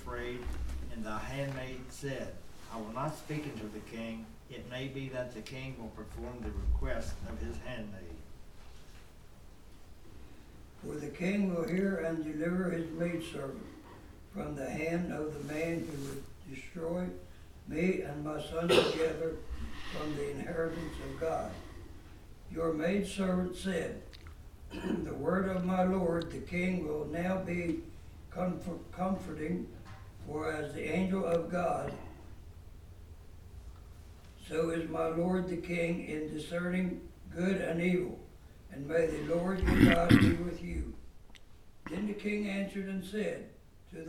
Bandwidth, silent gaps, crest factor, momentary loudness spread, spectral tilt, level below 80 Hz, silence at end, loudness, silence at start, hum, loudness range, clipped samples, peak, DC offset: 16 kHz; none; 26 dB; 21 LU; -6.5 dB/octave; -48 dBFS; 0 s; -35 LUFS; 0 s; none; 11 LU; under 0.1%; -8 dBFS; under 0.1%